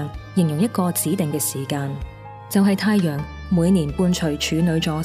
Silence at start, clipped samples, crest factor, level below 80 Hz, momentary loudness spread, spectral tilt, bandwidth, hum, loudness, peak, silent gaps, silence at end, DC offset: 0 s; under 0.1%; 14 dB; -42 dBFS; 9 LU; -5.5 dB/octave; 16 kHz; none; -21 LUFS; -6 dBFS; none; 0 s; under 0.1%